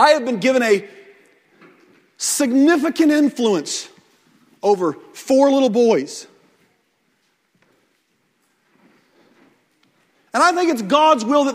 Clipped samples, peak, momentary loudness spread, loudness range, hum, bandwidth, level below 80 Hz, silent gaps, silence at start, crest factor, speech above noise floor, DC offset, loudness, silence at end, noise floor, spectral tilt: under 0.1%; 0 dBFS; 11 LU; 6 LU; none; 16 kHz; -70 dBFS; none; 0 s; 18 dB; 49 dB; under 0.1%; -17 LUFS; 0 s; -65 dBFS; -3.5 dB/octave